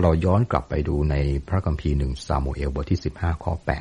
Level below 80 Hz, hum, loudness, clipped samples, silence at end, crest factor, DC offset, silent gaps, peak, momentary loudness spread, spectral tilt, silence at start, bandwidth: -28 dBFS; none; -24 LUFS; under 0.1%; 0 s; 18 dB; under 0.1%; none; -4 dBFS; 6 LU; -8 dB/octave; 0 s; 10.5 kHz